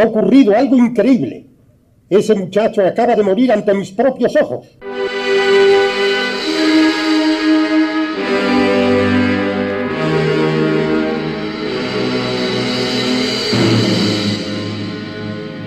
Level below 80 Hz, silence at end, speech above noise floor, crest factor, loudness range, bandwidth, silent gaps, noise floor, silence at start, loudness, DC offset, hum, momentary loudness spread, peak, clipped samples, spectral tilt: -50 dBFS; 0 s; 38 dB; 14 dB; 3 LU; 13 kHz; none; -50 dBFS; 0 s; -14 LUFS; under 0.1%; none; 10 LU; 0 dBFS; under 0.1%; -5.5 dB/octave